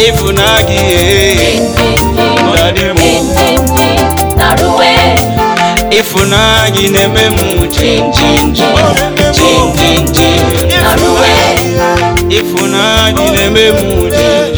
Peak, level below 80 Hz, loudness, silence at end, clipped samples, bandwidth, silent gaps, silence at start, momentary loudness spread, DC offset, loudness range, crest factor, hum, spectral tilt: 0 dBFS; -20 dBFS; -8 LUFS; 0 s; 2%; over 20 kHz; none; 0 s; 3 LU; under 0.1%; 1 LU; 8 dB; none; -4 dB/octave